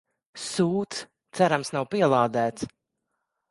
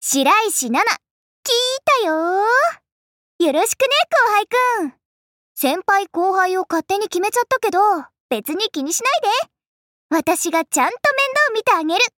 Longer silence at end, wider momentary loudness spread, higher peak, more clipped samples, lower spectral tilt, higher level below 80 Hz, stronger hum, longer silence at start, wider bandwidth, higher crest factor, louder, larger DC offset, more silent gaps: first, 0.8 s vs 0.1 s; first, 15 LU vs 7 LU; about the same, -6 dBFS vs -4 dBFS; neither; first, -5 dB/octave vs -1 dB/octave; about the same, -66 dBFS vs -68 dBFS; neither; first, 0.35 s vs 0 s; second, 11.5 kHz vs 17 kHz; first, 22 dB vs 14 dB; second, -25 LUFS vs -17 LUFS; neither; second, none vs 1.11-1.43 s, 2.92-3.39 s, 5.05-5.55 s, 8.20-8.29 s, 9.67-10.09 s